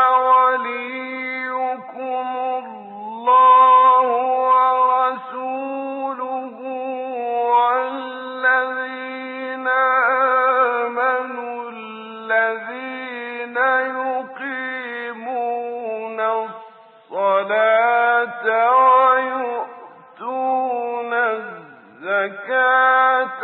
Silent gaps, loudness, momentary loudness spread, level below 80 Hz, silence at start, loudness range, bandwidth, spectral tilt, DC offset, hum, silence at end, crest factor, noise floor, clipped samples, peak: none; -18 LUFS; 15 LU; -90 dBFS; 0 s; 8 LU; 4.3 kHz; -7.5 dB/octave; under 0.1%; none; 0 s; 16 dB; -44 dBFS; under 0.1%; -4 dBFS